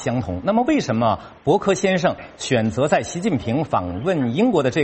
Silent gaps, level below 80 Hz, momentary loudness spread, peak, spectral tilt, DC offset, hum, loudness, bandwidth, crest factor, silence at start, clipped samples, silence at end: none; -48 dBFS; 5 LU; -2 dBFS; -6 dB/octave; under 0.1%; none; -20 LUFS; 8.8 kHz; 18 dB; 0 s; under 0.1%; 0 s